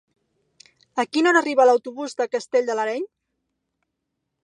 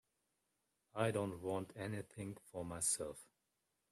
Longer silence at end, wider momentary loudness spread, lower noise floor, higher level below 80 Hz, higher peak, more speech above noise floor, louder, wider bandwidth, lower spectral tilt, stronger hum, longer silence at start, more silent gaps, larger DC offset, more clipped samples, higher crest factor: first, 1.4 s vs 0.7 s; about the same, 14 LU vs 12 LU; second, -79 dBFS vs -86 dBFS; second, -82 dBFS vs -74 dBFS; first, -4 dBFS vs -24 dBFS; first, 59 dB vs 44 dB; first, -21 LUFS vs -42 LUFS; second, 9.8 kHz vs 14.5 kHz; second, -2.5 dB/octave vs -4 dB/octave; neither; about the same, 0.95 s vs 0.95 s; neither; neither; neither; about the same, 18 dB vs 20 dB